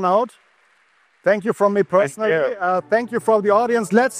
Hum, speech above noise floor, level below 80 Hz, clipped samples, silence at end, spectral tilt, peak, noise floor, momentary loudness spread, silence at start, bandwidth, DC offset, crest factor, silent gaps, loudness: none; 41 dB; -70 dBFS; under 0.1%; 0 s; -5.5 dB/octave; -2 dBFS; -59 dBFS; 4 LU; 0 s; 15 kHz; under 0.1%; 18 dB; none; -19 LUFS